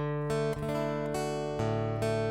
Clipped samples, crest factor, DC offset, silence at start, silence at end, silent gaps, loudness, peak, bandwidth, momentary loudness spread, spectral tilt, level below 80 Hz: under 0.1%; 12 dB; under 0.1%; 0 s; 0 s; none; -32 LUFS; -18 dBFS; 16 kHz; 2 LU; -6.5 dB/octave; -50 dBFS